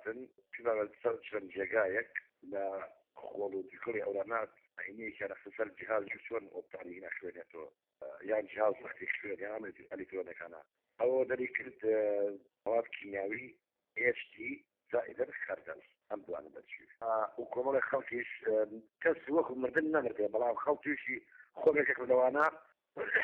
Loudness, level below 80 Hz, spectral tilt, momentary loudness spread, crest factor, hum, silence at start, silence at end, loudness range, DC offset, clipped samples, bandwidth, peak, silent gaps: -36 LUFS; -78 dBFS; -3.5 dB/octave; 16 LU; 20 dB; none; 0 s; 0 s; 7 LU; under 0.1%; under 0.1%; 4.2 kHz; -18 dBFS; none